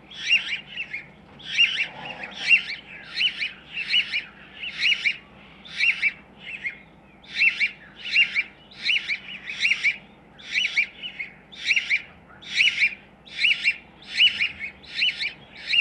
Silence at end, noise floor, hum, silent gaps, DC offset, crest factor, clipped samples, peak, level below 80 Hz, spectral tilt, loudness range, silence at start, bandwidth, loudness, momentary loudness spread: 0 s; -50 dBFS; none; none; under 0.1%; 20 dB; under 0.1%; -6 dBFS; -62 dBFS; 0 dB/octave; 3 LU; 0.05 s; 11 kHz; -22 LUFS; 17 LU